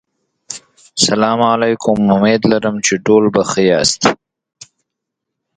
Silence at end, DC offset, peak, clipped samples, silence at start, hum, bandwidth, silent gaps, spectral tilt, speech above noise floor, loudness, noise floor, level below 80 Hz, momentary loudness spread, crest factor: 1.4 s; under 0.1%; 0 dBFS; under 0.1%; 0.5 s; none; 9.4 kHz; none; -4 dB/octave; 66 dB; -13 LUFS; -78 dBFS; -50 dBFS; 17 LU; 14 dB